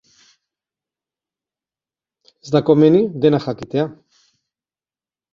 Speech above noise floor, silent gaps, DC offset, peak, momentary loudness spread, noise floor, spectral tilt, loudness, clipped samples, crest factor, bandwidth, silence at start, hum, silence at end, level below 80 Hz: over 75 dB; none; under 0.1%; -2 dBFS; 11 LU; under -90 dBFS; -8 dB/octave; -16 LUFS; under 0.1%; 18 dB; 7.2 kHz; 2.45 s; none; 1.4 s; -60 dBFS